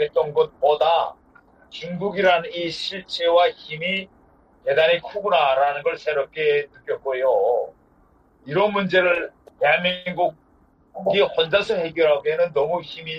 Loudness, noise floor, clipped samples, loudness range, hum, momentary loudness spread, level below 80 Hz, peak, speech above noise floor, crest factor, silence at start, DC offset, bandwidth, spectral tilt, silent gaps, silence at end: -21 LUFS; -57 dBFS; under 0.1%; 2 LU; none; 10 LU; -60 dBFS; -4 dBFS; 36 dB; 18 dB; 0 s; under 0.1%; 8.8 kHz; -5 dB/octave; none; 0 s